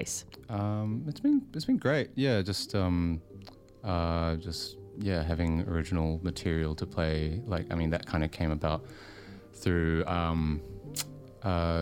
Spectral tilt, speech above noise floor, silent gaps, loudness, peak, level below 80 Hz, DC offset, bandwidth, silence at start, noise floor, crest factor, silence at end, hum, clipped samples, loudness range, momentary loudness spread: -6 dB/octave; 20 dB; none; -31 LUFS; -12 dBFS; -42 dBFS; under 0.1%; 16 kHz; 0 s; -50 dBFS; 18 dB; 0 s; none; under 0.1%; 2 LU; 10 LU